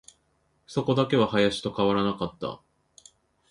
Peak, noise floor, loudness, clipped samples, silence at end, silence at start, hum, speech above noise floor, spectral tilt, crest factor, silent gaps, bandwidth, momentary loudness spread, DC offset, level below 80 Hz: -8 dBFS; -70 dBFS; -26 LUFS; under 0.1%; 0.95 s; 0.7 s; none; 45 dB; -6 dB/octave; 18 dB; none; 11.5 kHz; 13 LU; under 0.1%; -58 dBFS